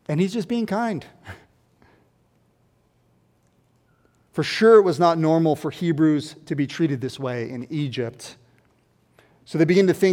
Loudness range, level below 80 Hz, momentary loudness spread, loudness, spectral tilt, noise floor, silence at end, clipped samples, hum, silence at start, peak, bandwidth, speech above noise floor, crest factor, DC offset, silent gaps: 12 LU; -66 dBFS; 18 LU; -21 LUFS; -6.5 dB/octave; -63 dBFS; 0 s; under 0.1%; none; 0.1 s; -4 dBFS; 16 kHz; 42 dB; 18 dB; under 0.1%; none